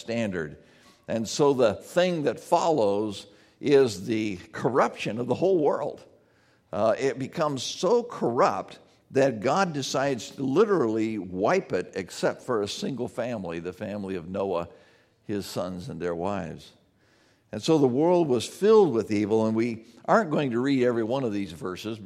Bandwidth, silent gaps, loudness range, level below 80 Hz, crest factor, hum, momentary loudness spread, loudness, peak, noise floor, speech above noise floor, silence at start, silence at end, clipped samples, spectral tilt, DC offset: 14.5 kHz; none; 9 LU; -66 dBFS; 20 dB; none; 12 LU; -26 LUFS; -6 dBFS; -63 dBFS; 37 dB; 0 s; 0 s; under 0.1%; -5.5 dB/octave; under 0.1%